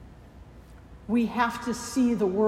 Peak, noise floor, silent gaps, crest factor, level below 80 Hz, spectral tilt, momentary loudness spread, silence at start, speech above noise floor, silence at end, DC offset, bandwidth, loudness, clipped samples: -10 dBFS; -48 dBFS; none; 18 dB; -52 dBFS; -5.5 dB/octave; 7 LU; 0 s; 23 dB; 0 s; under 0.1%; 15 kHz; -27 LUFS; under 0.1%